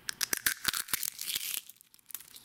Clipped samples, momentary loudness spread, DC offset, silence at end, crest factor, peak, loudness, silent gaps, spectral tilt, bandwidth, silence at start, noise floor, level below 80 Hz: under 0.1%; 15 LU; under 0.1%; 0 s; 30 dB; -8 dBFS; -32 LUFS; none; 1.5 dB/octave; 17.5 kHz; 0.05 s; -57 dBFS; -64 dBFS